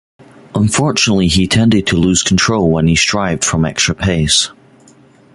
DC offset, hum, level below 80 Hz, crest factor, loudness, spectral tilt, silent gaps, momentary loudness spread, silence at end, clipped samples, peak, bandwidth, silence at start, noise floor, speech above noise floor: under 0.1%; none; -32 dBFS; 14 dB; -12 LUFS; -4 dB/octave; none; 3 LU; 0.85 s; under 0.1%; 0 dBFS; 11.5 kHz; 0.55 s; -45 dBFS; 32 dB